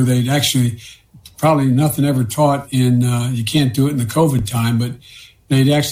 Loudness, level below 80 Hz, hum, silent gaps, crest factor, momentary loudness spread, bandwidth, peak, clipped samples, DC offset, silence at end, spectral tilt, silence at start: -16 LUFS; -46 dBFS; none; none; 12 dB; 5 LU; 16 kHz; -4 dBFS; under 0.1%; under 0.1%; 0 s; -6 dB/octave; 0 s